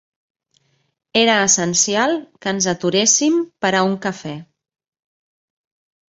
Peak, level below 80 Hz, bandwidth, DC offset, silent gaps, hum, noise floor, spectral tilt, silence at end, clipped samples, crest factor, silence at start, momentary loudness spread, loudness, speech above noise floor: -2 dBFS; -62 dBFS; 8.2 kHz; under 0.1%; none; none; -63 dBFS; -2.5 dB/octave; 1.7 s; under 0.1%; 18 dB; 1.15 s; 12 LU; -16 LUFS; 46 dB